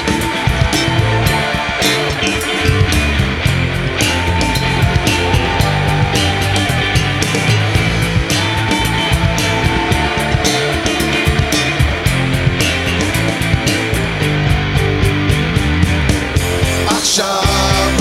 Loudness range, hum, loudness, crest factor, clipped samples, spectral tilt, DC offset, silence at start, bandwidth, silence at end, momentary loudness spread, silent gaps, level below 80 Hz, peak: 1 LU; none; -14 LUFS; 14 dB; under 0.1%; -4.5 dB/octave; under 0.1%; 0 s; 16.5 kHz; 0 s; 2 LU; none; -24 dBFS; 0 dBFS